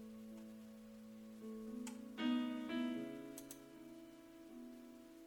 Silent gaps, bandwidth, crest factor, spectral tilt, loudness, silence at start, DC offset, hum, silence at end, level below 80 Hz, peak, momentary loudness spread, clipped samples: none; 19 kHz; 20 dB; -4.5 dB/octave; -47 LUFS; 0 s; under 0.1%; none; 0 s; -78 dBFS; -28 dBFS; 17 LU; under 0.1%